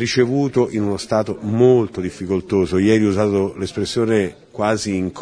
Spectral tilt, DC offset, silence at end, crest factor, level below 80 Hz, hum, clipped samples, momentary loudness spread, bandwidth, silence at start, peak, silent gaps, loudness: -6 dB/octave; under 0.1%; 0 s; 16 dB; -50 dBFS; none; under 0.1%; 8 LU; 10.5 kHz; 0 s; -2 dBFS; none; -18 LUFS